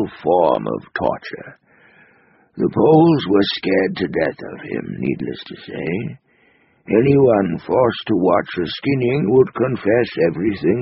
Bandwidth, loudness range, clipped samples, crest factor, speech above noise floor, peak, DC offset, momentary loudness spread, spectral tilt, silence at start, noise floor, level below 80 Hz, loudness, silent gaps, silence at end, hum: 5.8 kHz; 5 LU; under 0.1%; 16 dB; 39 dB; -2 dBFS; under 0.1%; 14 LU; -5.5 dB/octave; 0 s; -56 dBFS; -52 dBFS; -18 LUFS; none; 0 s; none